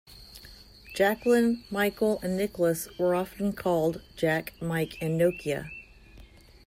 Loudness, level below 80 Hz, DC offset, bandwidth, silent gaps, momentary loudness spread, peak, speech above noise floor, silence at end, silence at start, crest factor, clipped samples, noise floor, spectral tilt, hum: -28 LUFS; -54 dBFS; under 0.1%; 16 kHz; none; 17 LU; -12 dBFS; 25 dB; 0.4 s; 0.1 s; 16 dB; under 0.1%; -52 dBFS; -6 dB/octave; none